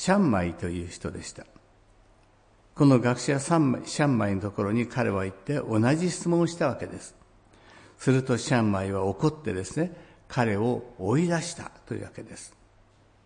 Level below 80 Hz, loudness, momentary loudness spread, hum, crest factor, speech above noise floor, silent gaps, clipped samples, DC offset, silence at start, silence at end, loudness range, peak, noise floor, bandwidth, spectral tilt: -58 dBFS; -27 LUFS; 16 LU; none; 18 dB; 34 dB; none; under 0.1%; under 0.1%; 0 s; 0.75 s; 4 LU; -8 dBFS; -59 dBFS; 10.5 kHz; -6 dB/octave